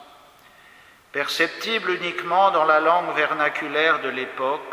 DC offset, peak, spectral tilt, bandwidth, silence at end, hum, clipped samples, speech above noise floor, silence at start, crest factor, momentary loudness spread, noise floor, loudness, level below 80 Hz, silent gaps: under 0.1%; -4 dBFS; -3 dB/octave; 16 kHz; 0 s; none; under 0.1%; 29 dB; 0 s; 18 dB; 9 LU; -51 dBFS; -21 LUFS; -72 dBFS; none